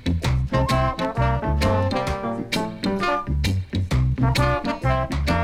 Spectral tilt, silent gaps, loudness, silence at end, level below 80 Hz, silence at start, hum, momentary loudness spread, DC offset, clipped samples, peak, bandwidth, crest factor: -6.5 dB/octave; none; -23 LUFS; 0 s; -28 dBFS; 0 s; none; 5 LU; under 0.1%; under 0.1%; -8 dBFS; 15.5 kHz; 14 dB